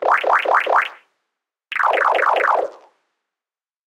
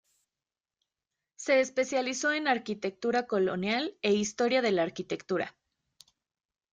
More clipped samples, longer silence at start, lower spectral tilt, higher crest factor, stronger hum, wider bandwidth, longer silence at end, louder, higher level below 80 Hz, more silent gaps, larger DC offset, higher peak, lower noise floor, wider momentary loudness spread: neither; second, 0 s vs 1.4 s; second, -1 dB/octave vs -4 dB/octave; about the same, 18 dB vs 18 dB; neither; first, 16.5 kHz vs 9.4 kHz; about the same, 1.2 s vs 1.25 s; first, -17 LUFS vs -29 LUFS; about the same, -74 dBFS vs -74 dBFS; neither; neither; first, -2 dBFS vs -14 dBFS; about the same, under -90 dBFS vs under -90 dBFS; first, 10 LU vs 7 LU